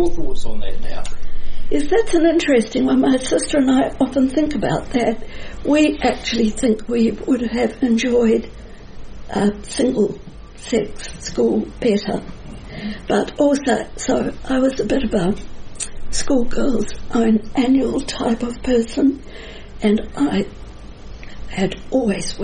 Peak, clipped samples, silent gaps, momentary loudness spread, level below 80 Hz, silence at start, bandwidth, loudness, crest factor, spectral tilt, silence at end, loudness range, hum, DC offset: -2 dBFS; under 0.1%; none; 18 LU; -30 dBFS; 0 s; 10 kHz; -19 LUFS; 14 dB; -5 dB/octave; 0 s; 5 LU; none; under 0.1%